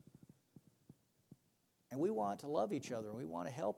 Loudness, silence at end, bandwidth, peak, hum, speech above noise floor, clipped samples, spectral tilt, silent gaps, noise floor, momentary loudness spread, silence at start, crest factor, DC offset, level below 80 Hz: -41 LUFS; 0 s; 16.5 kHz; -24 dBFS; none; 38 dB; under 0.1%; -6.5 dB/octave; none; -79 dBFS; 7 LU; 0.9 s; 20 dB; under 0.1%; -82 dBFS